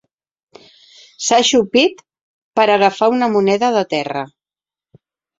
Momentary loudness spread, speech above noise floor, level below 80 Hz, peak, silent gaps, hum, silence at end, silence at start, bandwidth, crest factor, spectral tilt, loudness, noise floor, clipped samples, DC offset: 10 LU; over 76 dB; -60 dBFS; 0 dBFS; 2.21-2.51 s; none; 1.1 s; 1.2 s; 8 kHz; 16 dB; -3 dB/octave; -15 LUFS; under -90 dBFS; under 0.1%; under 0.1%